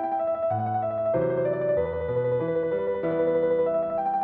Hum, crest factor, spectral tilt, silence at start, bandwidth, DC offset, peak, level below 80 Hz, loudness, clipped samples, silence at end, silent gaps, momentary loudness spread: none; 12 dB; -7.5 dB/octave; 0 s; 3.9 kHz; under 0.1%; -12 dBFS; -54 dBFS; -26 LUFS; under 0.1%; 0 s; none; 3 LU